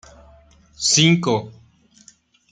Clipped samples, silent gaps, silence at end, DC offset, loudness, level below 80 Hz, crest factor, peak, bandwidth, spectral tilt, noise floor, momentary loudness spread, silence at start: under 0.1%; none; 1 s; under 0.1%; -17 LUFS; -56 dBFS; 20 dB; -2 dBFS; 9.6 kHz; -3.5 dB/octave; -53 dBFS; 12 LU; 0.8 s